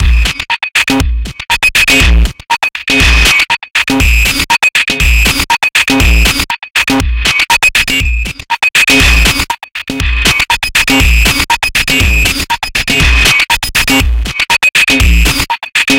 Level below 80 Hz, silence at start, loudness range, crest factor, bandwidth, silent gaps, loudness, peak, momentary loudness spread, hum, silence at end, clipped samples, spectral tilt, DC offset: -14 dBFS; 0 s; 1 LU; 10 dB; 17 kHz; none; -8 LUFS; 0 dBFS; 7 LU; none; 0 s; under 0.1%; -2.5 dB/octave; under 0.1%